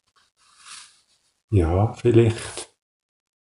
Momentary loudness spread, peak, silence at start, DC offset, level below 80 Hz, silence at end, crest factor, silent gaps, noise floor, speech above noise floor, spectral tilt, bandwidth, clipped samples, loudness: 24 LU; -2 dBFS; 0.7 s; under 0.1%; -40 dBFS; 0.85 s; 22 dB; 1.44-1.48 s; -64 dBFS; 45 dB; -7 dB/octave; 11.5 kHz; under 0.1%; -21 LUFS